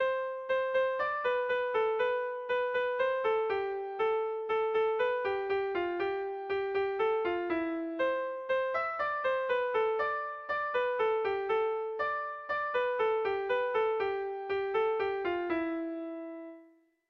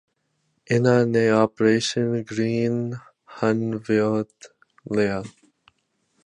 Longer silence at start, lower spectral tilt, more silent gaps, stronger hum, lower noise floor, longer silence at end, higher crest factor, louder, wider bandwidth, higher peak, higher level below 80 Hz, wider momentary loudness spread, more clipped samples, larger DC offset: second, 0 s vs 0.7 s; about the same, -5.5 dB/octave vs -6 dB/octave; neither; neither; second, -61 dBFS vs -71 dBFS; second, 0.45 s vs 0.95 s; second, 12 dB vs 20 dB; second, -32 LUFS vs -22 LUFS; second, 6 kHz vs 10.5 kHz; second, -20 dBFS vs -4 dBFS; second, -68 dBFS vs -60 dBFS; second, 5 LU vs 12 LU; neither; neither